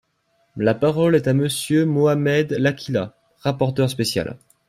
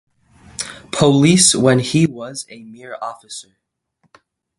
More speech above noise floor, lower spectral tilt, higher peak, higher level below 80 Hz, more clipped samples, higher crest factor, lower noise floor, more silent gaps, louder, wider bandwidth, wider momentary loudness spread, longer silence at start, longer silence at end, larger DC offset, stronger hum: about the same, 47 dB vs 49 dB; first, -6 dB/octave vs -4 dB/octave; second, -4 dBFS vs 0 dBFS; about the same, -56 dBFS vs -52 dBFS; neither; about the same, 16 dB vs 18 dB; about the same, -66 dBFS vs -65 dBFS; neither; second, -20 LUFS vs -13 LUFS; first, 15.5 kHz vs 11.5 kHz; second, 9 LU vs 23 LU; about the same, 0.55 s vs 0.6 s; second, 0.3 s vs 1.2 s; neither; neither